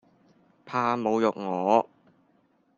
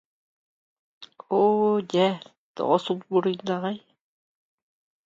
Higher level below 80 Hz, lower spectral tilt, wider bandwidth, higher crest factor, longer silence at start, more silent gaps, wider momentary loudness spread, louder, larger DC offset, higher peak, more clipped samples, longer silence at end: about the same, -74 dBFS vs -74 dBFS; about the same, -6.5 dB/octave vs -6.5 dB/octave; about the same, 7.4 kHz vs 7.6 kHz; about the same, 22 dB vs 20 dB; second, 0.65 s vs 1 s; second, none vs 2.38-2.54 s; second, 7 LU vs 13 LU; about the same, -26 LUFS vs -24 LUFS; neither; about the same, -6 dBFS vs -8 dBFS; neither; second, 0.95 s vs 1.25 s